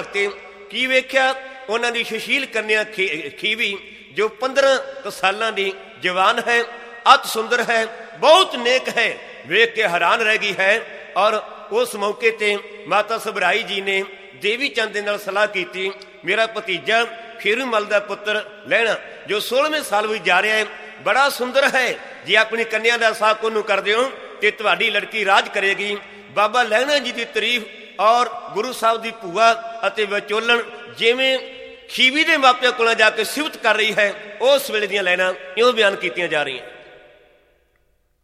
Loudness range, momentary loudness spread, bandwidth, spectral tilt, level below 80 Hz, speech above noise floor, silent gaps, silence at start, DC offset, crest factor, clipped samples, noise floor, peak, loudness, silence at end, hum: 4 LU; 10 LU; 15.5 kHz; -2 dB/octave; -66 dBFS; 44 dB; none; 0 s; under 0.1%; 20 dB; under 0.1%; -63 dBFS; 0 dBFS; -18 LUFS; 1.35 s; none